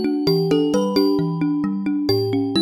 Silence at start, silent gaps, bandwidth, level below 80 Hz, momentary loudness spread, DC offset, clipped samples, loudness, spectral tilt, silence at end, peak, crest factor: 0 s; none; 13 kHz; -52 dBFS; 4 LU; under 0.1%; under 0.1%; -20 LUFS; -7 dB/octave; 0 s; -4 dBFS; 14 dB